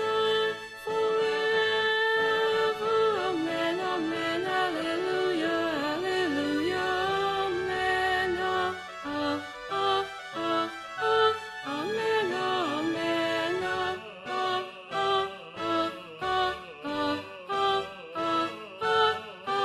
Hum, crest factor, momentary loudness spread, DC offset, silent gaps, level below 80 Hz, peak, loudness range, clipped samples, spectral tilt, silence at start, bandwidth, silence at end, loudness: none; 16 dB; 9 LU; under 0.1%; none; -62 dBFS; -12 dBFS; 4 LU; under 0.1%; -4 dB/octave; 0 s; 13.5 kHz; 0 s; -28 LUFS